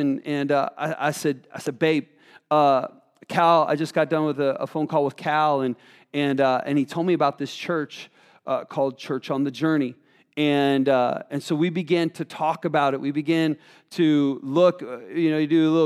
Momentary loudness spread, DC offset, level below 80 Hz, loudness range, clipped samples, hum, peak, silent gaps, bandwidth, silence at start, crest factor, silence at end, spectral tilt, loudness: 11 LU; under 0.1%; -80 dBFS; 3 LU; under 0.1%; none; -6 dBFS; none; 14.5 kHz; 0 s; 18 dB; 0 s; -6.5 dB/octave; -23 LUFS